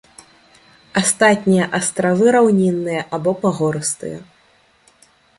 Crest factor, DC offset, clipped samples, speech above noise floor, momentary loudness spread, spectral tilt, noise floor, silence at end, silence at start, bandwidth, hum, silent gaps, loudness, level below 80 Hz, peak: 16 dB; under 0.1%; under 0.1%; 39 dB; 10 LU; -4.5 dB/octave; -55 dBFS; 1.15 s; 0.95 s; 11.5 kHz; none; none; -17 LUFS; -58 dBFS; -2 dBFS